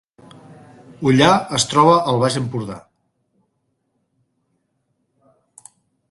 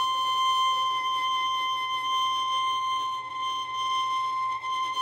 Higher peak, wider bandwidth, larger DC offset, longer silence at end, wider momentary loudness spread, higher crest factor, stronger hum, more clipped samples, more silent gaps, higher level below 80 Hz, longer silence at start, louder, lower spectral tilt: first, 0 dBFS vs -16 dBFS; second, 11.5 kHz vs 16 kHz; neither; first, 3.3 s vs 0 s; first, 15 LU vs 6 LU; first, 20 dB vs 10 dB; neither; neither; neither; first, -56 dBFS vs -72 dBFS; first, 1 s vs 0 s; first, -16 LUFS vs -27 LUFS; first, -4.5 dB/octave vs 0.5 dB/octave